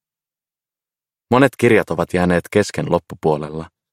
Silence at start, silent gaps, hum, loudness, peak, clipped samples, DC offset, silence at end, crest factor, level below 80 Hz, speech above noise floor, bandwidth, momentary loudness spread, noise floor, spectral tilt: 1.3 s; none; none; -17 LUFS; 0 dBFS; under 0.1%; under 0.1%; 0.25 s; 18 dB; -48 dBFS; over 73 dB; 16 kHz; 8 LU; under -90 dBFS; -6.5 dB/octave